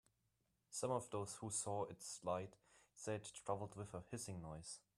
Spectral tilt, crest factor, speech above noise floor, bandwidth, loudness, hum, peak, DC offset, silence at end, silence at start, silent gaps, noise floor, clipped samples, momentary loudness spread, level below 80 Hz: -4.5 dB/octave; 20 dB; 38 dB; 13 kHz; -47 LUFS; none; -28 dBFS; under 0.1%; 0.2 s; 0.7 s; none; -85 dBFS; under 0.1%; 9 LU; -76 dBFS